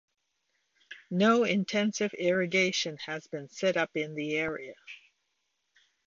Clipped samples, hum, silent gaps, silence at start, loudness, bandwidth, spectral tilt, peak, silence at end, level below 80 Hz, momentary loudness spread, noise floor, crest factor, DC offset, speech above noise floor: under 0.1%; none; none; 0.9 s; -29 LUFS; 7.6 kHz; -4.5 dB/octave; -14 dBFS; 1.1 s; -72 dBFS; 22 LU; -79 dBFS; 18 dB; under 0.1%; 50 dB